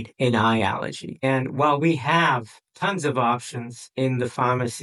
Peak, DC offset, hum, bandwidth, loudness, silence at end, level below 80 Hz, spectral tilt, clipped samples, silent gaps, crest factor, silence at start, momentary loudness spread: -6 dBFS; under 0.1%; none; 12 kHz; -23 LUFS; 0 s; -66 dBFS; -5.5 dB/octave; under 0.1%; none; 16 dB; 0 s; 9 LU